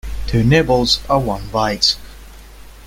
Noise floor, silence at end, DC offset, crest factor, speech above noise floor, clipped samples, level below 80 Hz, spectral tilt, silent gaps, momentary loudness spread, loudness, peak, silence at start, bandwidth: -38 dBFS; 0 s; under 0.1%; 16 dB; 22 dB; under 0.1%; -30 dBFS; -5 dB/octave; none; 8 LU; -16 LUFS; 0 dBFS; 0.05 s; 16.5 kHz